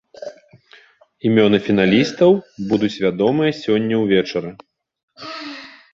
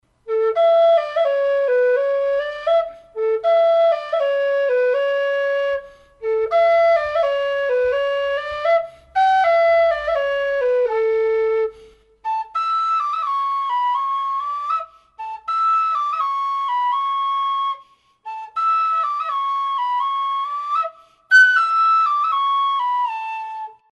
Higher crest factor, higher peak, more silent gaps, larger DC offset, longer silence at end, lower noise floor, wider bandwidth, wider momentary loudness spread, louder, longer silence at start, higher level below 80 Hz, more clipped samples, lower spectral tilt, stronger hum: about the same, 18 dB vs 14 dB; about the same, -2 dBFS vs -4 dBFS; first, 5.03-5.08 s vs none; neither; about the same, 0.25 s vs 0.2 s; about the same, -50 dBFS vs -49 dBFS; second, 7.6 kHz vs 9.6 kHz; first, 20 LU vs 10 LU; about the same, -17 LUFS vs -19 LUFS; about the same, 0.2 s vs 0.25 s; about the same, -56 dBFS vs -58 dBFS; neither; first, -6.5 dB/octave vs -1 dB/octave; neither